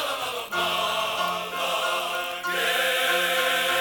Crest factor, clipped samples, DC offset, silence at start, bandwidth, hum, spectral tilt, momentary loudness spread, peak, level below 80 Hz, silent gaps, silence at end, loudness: 14 dB; under 0.1%; under 0.1%; 0 s; 19.5 kHz; none; -0.5 dB/octave; 6 LU; -12 dBFS; -68 dBFS; none; 0 s; -24 LUFS